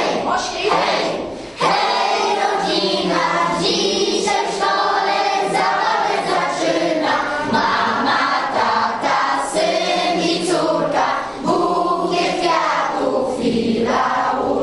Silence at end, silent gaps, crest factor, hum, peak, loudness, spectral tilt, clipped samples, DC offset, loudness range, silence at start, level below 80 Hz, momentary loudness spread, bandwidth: 0 s; none; 14 dB; none; -4 dBFS; -18 LUFS; -3.5 dB/octave; under 0.1%; under 0.1%; 1 LU; 0 s; -52 dBFS; 3 LU; 11.5 kHz